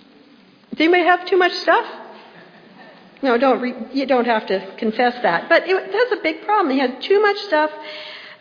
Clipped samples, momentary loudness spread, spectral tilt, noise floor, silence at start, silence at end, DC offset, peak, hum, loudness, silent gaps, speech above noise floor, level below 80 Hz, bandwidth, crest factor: under 0.1%; 11 LU; -5 dB/octave; -49 dBFS; 0.7 s; 0.05 s; under 0.1%; 0 dBFS; none; -18 LUFS; none; 32 dB; -70 dBFS; 5.2 kHz; 18 dB